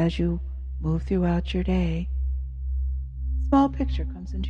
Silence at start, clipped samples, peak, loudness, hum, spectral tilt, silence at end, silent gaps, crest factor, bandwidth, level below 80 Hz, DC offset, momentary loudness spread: 0 s; under 0.1%; -10 dBFS; -27 LUFS; none; -8.5 dB/octave; 0 s; none; 16 dB; 6.6 kHz; -28 dBFS; under 0.1%; 10 LU